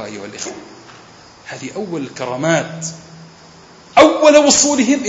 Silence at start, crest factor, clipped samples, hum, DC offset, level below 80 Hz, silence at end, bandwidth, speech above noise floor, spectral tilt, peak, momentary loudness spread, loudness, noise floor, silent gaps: 0 s; 16 dB; under 0.1%; none; under 0.1%; -54 dBFS; 0 s; 8.2 kHz; 27 dB; -3 dB/octave; 0 dBFS; 20 LU; -13 LUFS; -42 dBFS; none